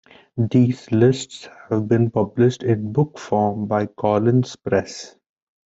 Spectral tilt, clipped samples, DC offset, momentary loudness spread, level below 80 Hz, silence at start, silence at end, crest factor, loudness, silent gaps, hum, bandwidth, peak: -7.5 dB/octave; under 0.1%; under 0.1%; 16 LU; -58 dBFS; 0.35 s; 0.55 s; 16 dB; -20 LUFS; none; none; 8 kHz; -4 dBFS